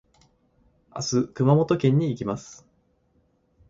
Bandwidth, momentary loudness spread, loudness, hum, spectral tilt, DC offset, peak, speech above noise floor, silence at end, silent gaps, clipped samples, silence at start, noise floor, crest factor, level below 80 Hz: 7.6 kHz; 16 LU; -23 LUFS; none; -6.5 dB/octave; under 0.1%; -8 dBFS; 44 dB; 1.15 s; none; under 0.1%; 0.95 s; -66 dBFS; 18 dB; -58 dBFS